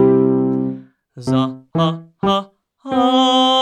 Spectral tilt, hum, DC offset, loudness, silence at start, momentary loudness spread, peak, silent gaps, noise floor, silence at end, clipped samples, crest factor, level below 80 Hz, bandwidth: -6 dB/octave; none; under 0.1%; -17 LUFS; 0 s; 13 LU; -4 dBFS; none; -36 dBFS; 0 s; under 0.1%; 14 dB; -54 dBFS; 9.4 kHz